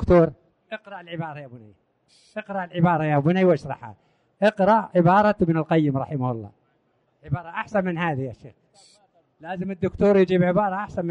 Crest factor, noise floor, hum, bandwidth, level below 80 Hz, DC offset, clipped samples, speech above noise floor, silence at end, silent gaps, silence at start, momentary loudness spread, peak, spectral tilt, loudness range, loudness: 16 dB; -67 dBFS; none; 8.4 kHz; -46 dBFS; under 0.1%; under 0.1%; 45 dB; 0 s; none; 0 s; 19 LU; -6 dBFS; -9 dB/octave; 9 LU; -22 LUFS